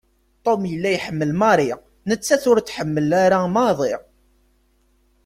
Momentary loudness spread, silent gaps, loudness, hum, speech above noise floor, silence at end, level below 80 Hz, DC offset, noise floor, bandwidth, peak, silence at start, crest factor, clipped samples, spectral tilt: 9 LU; none; -19 LUFS; none; 42 dB; 1.25 s; -56 dBFS; under 0.1%; -61 dBFS; 16 kHz; -2 dBFS; 0.45 s; 18 dB; under 0.1%; -5.5 dB/octave